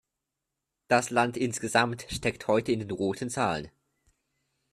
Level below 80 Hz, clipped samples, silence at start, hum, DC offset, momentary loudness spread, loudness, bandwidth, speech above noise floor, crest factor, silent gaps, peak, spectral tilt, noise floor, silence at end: -58 dBFS; under 0.1%; 0.9 s; none; under 0.1%; 6 LU; -28 LUFS; 14 kHz; 58 dB; 22 dB; none; -8 dBFS; -4.5 dB/octave; -85 dBFS; 1.05 s